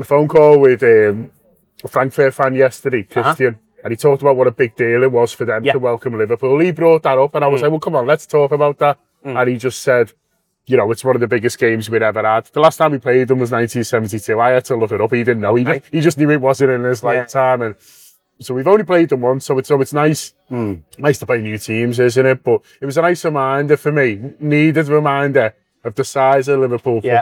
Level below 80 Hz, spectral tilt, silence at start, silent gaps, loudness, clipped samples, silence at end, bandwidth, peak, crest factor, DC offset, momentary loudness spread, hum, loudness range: -62 dBFS; -6.5 dB/octave; 0 s; none; -15 LUFS; under 0.1%; 0 s; 17 kHz; 0 dBFS; 14 dB; under 0.1%; 7 LU; none; 2 LU